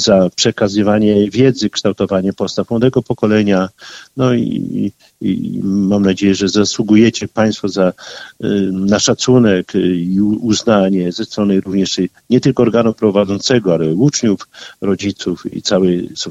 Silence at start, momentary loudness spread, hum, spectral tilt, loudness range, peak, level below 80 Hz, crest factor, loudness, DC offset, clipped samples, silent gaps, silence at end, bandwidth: 0 s; 8 LU; none; -5.5 dB/octave; 2 LU; 0 dBFS; -48 dBFS; 14 dB; -14 LUFS; under 0.1%; under 0.1%; none; 0 s; 8.2 kHz